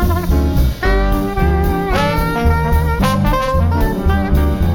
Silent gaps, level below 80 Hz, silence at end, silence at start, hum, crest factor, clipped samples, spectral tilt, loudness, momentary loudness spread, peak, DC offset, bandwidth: none; -18 dBFS; 0 s; 0 s; none; 12 dB; under 0.1%; -7 dB/octave; -16 LUFS; 2 LU; -2 dBFS; under 0.1%; 19 kHz